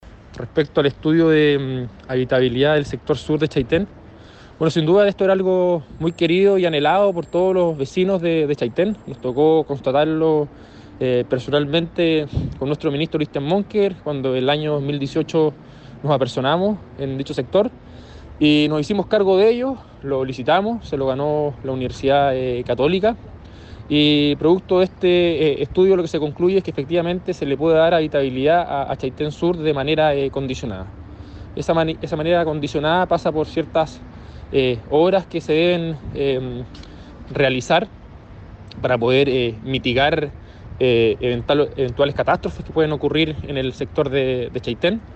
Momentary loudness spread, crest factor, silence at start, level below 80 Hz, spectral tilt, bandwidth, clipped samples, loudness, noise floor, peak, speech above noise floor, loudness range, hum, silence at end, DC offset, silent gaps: 10 LU; 14 dB; 0.05 s; -42 dBFS; -7 dB/octave; 8.6 kHz; under 0.1%; -19 LUFS; -42 dBFS; -4 dBFS; 24 dB; 3 LU; none; 0 s; under 0.1%; none